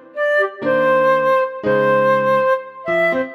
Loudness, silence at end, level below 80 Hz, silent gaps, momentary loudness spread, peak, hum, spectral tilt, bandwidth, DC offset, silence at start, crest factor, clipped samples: -16 LUFS; 0 s; -60 dBFS; none; 4 LU; -6 dBFS; none; -6.5 dB/octave; 12 kHz; under 0.1%; 0.15 s; 10 dB; under 0.1%